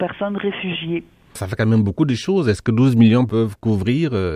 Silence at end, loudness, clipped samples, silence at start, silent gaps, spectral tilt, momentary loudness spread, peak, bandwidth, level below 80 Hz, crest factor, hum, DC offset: 0 s; -18 LUFS; under 0.1%; 0 s; none; -7.5 dB/octave; 13 LU; -2 dBFS; 12.5 kHz; -48 dBFS; 16 dB; none; under 0.1%